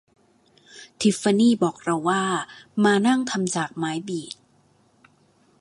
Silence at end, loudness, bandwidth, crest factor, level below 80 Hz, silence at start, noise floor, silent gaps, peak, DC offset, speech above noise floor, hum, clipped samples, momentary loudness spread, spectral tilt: 1.3 s; -23 LUFS; 11.5 kHz; 18 dB; -68 dBFS; 0.75 s; -61 dBFS; none; -6 dBFS; under 0.1%; 39 dB; none; under 0.1%; 13 LU; -4.5 dB/octave